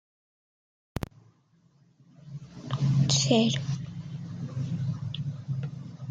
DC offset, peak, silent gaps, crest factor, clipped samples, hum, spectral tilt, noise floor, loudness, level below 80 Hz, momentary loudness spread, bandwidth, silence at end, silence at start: under 0.1%; -8 dBFS; none; 22 dB; under 0.1%; none; -5 dB/octave; -64 dBFS; -29 LUFS; -56 dBFS; 18 LU; 9.4 kHz; 0 s; 0.95 s